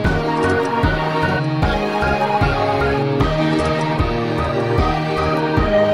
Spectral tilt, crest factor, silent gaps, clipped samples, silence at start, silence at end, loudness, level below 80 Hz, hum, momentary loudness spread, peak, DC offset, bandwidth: -7 dB/octave; 14 dB; none; under 0.1%; 0 s; 0 s; -18 LUFS; -28 dBFS; none; 2 LU; -2 dBFS; 0.2%; 14 kHz